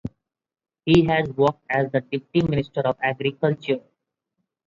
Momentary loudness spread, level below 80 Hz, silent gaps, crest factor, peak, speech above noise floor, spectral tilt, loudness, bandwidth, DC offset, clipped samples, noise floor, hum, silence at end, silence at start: 9 LU; -50 dBFS; none; 18 dB; -6 dBFS; 57 dB; -7.5 dB/octave; -22 LUFS; 7.6 kHz; under 0.1%; under 0.1%; -79 dBFS; none; 0.9 s; 0.05 s